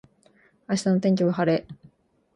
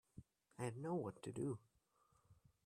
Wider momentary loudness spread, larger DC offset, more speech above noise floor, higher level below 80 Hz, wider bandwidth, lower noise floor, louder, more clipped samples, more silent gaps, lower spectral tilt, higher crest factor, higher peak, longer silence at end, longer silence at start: second, 6 LU vs 20 LU; neither; first, 38 dB vs 33 dB; first, -64 dBFS vs -78 dBFS; second, 11 kHz vs 13.5 kHz; second, -60 dBFS vs -79 dBFS; first, -24 LUFS vs -48 LUFS; neither; neither; about the same, -6.5 dB/octave vs -7 dB/octave; about the same, 16 dB vs 18 dB; first, -10 dBFS vs -32 dBFS; first, 0.6 s vs 0.3 s; first, 0.7 s vs 0.15 s